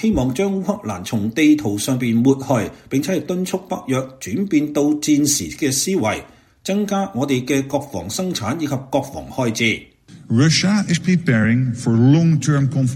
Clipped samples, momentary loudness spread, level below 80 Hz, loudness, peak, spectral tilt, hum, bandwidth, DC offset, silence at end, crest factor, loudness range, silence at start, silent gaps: under 0.1%; 9 LU; -46 dBFS; -19 LUFS; -2 dBFS; -5 dB/octave; none; 16.5 kHz; under 0.1%; 0 s; 16 dB; 5 LU; 0 s; none